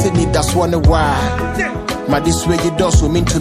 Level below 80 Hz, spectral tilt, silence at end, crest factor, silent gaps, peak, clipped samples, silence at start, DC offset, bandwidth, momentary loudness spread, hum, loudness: -22 dBFS; -5.5 dB/octave; 0 s; 14 dB; none; 0 dBFS; under 0.1%; 0 s; under 0.1%; 15 kHz; 6 LU; none; -15 LUFS